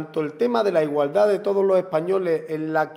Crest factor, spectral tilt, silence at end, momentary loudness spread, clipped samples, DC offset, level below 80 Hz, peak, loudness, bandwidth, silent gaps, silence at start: 14 dB; -7 dB/octave; 0 s; 5 LU; under 0.1%; under 0.1%; -76 dBFS; -6 dBFS; -22 LUFS; 15.5 kHz; none; 0 s